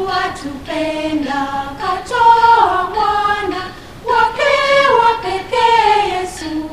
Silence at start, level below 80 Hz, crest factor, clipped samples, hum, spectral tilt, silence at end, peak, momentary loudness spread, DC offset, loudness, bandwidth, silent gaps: 0 s; -42 dBFS; 14 dB; under 0.1%; none; -3.5 dB/octave; 0 s; 0 dBFS; 12 LU; 0.6%; -14 LUFS; 14.5 kHz; none